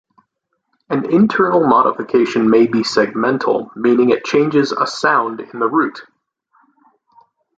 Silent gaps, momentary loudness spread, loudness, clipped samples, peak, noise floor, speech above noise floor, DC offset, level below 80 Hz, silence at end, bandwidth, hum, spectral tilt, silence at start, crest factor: none; 6 LU; -15 LUFS; under 0.1%; 0 dBFS; -71 dBFS; 57 dB; under 0.1%; -58 dBFS; 1.55 s; 8.6 kHz; none; -6 dB/octave; 0.9 s; 16 dB